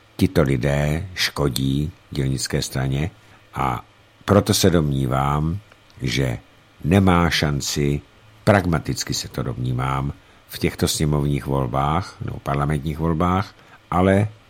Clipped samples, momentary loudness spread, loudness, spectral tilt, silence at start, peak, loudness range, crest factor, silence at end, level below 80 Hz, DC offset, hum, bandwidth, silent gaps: under 0.1%; 12 LU; -21 LUFS; -5.5 dB/octave; 0.2 s; 0 dBFS; 3 LU; 20 dB; 0.15 s; -36 dBFS; under 0.1%; none; 16.5 kHz; none